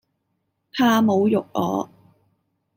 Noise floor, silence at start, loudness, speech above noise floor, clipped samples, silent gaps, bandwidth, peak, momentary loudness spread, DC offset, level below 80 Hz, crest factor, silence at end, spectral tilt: -74 dBFS; 0.75 s; -20 LUFS; 55 dB; under 0.1%; none; 16.5 kHz; -6 dBFS; 14 LU; under 0.1%; -66 dBFS; 16 dB; 0.9 s; -6 dB/octave